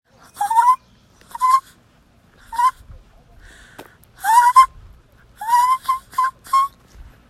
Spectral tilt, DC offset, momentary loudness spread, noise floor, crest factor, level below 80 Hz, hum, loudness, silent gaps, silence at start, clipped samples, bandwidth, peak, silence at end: 0 dB/octave; under 0.1%; 13 LU; -54 dBFS; 20 dB; -50 dBFS; none; -17 LUFS; none; 0.35 s; under 0.1%; 15.5 kHz; 0 dBFS; 0.6 s